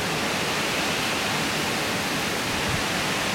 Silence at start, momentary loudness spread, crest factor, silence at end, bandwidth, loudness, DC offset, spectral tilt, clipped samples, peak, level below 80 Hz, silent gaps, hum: 0 s; 1 LU; 12 dB; 0 s; 16.5 kHz; -24 LUFS; under 0.1%; -2.5 dB/octave; under 0.1%; -12 dBFS; -48 dBFS; none; none